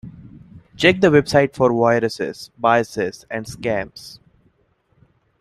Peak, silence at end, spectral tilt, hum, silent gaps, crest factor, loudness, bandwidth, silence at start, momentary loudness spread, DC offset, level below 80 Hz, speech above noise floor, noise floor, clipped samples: -2 dBFS; 1.25 s; -5.5 dB/octave; none; none; 18 dB; -18 LUFS; 14 kHz; 0.05 s; 16 LU; under 0.1%; -52 dBFS; 44 dB; -62 dBFS; under 0.1%